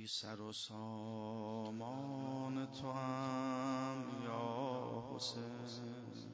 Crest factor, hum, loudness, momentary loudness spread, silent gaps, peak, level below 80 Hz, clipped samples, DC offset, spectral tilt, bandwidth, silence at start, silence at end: 14 dB; none; -44 LUFS; 7 LU; none; -30 dBFS; -80 dBFS; under 0.1%; under 0.1%; -5.5 dB/octave; 8 kHz; 0 s; 0 s